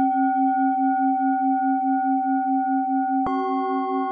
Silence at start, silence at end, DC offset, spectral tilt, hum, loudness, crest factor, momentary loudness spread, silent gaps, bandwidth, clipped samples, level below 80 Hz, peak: 0 s; 0 s; under 0.1%; -8 dB/octave; none; -22 LUFS; 10 dB; 3 LU; none; 4.8 kHz; under 0.1%; -64 dBFS; -12 dBFS